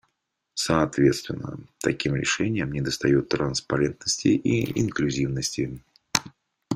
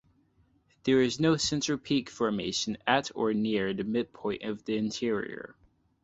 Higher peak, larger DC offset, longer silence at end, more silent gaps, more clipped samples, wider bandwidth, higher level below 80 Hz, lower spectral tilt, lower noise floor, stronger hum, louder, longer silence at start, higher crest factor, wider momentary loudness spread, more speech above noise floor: first, 0 dBFS vs -8 dBFS; neither; second, 0 s vs 0.5 s; neither; neither; first, 16 kHz vs 8.2 kHz; first, -50 dBFS vs -62 dBFS; about the same, -4.5 dB/octave vs -4.5 dB/octave; first, -78 dBFS vs -67 dBFS; neither; first, -25 LUFS vs -29 LUFS; second, 0.55 s vs 0.85 s; about the same, 24 dB vs 22 dB; about the same, 9 LU vs 9 LU; first, 53 dB vs 38 dB